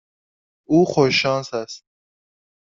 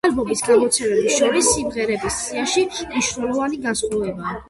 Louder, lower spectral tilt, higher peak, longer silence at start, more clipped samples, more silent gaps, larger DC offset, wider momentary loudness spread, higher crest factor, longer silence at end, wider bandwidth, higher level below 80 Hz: about the same, -19 LUFS vs -19 LUFS; first, -5.5 dB/octave vs -2.5 dB/octave; about the same, -2 dBFS vs -4 dBFS; first, 0.7 s vs 0.05 s; neither; neither; neither; first, 17 LU vs 7 LU; about the same, 20 dB vs 16 dB; first, 0.95 s vs 0.05 s; second, 7.6 kHz vs 12 kHz; second, -60 dBFS vs -46 dBFS